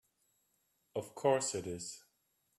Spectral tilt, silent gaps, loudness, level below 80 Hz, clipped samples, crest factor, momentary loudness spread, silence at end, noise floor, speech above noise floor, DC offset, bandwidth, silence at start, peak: -3.5 dB/octave; none; -37 LUFS; -78 dBFS; under 0.1%; 22 dB; 14 LU; 0.6 s; -79 dBFS; 43 dB; under 0.1%; 13.5 kHz; 0.95 s; -18 dBFS